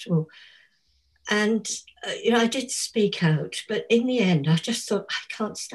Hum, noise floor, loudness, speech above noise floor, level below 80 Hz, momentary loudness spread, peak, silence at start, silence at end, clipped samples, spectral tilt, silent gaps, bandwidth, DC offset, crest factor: none; -67 dBFS; -24 LUFS; 42 dB; -68 dBFS; 10 LU; -8 dBFS; 0 s; 0 s; under 0.1%; -4.5 dB/octave; none; 12.5 kHz; under 0.1%; 18 dB